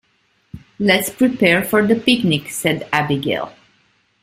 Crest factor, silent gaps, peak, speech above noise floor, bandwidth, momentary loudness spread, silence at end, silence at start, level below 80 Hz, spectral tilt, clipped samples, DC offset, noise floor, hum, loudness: 18 dB; none; -2 dBFS; 45 dB; 16 kHz; 7 LU; 0.7 s; 0.55 s; -54 dBFS; -4.5 dB/octave; under 0.1%; under 0.1%; -62 dBFS; none; -17 LUFS